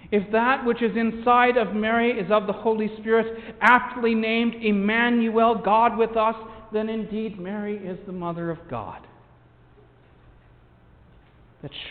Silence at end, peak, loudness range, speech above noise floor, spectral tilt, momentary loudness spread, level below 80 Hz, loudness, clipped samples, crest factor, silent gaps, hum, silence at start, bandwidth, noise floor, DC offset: 0 s; -4 dBFS; 15 LU; 31 dB; -7.5 dB/octave; 14 LU; -54 dBFS; -22 LUFS; under 0.1%; 20 dB; none; none; 0.05 s; 5.2 kHz; -54 dBFS; under 0.1%